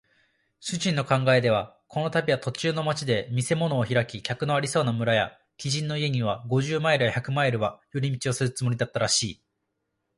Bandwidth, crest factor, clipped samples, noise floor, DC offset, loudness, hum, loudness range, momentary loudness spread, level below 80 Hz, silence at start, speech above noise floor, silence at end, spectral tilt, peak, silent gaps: 11.5 kHz; 18 dB; under 0.1%; -79 dBFS; under 0.1%; -26 LUFS; none; 1 LU; 7 LU; -58 dBFS; 0.6 s; 53 dB; 0.85 s; -4.5 dB/octave; -8 dBFS; none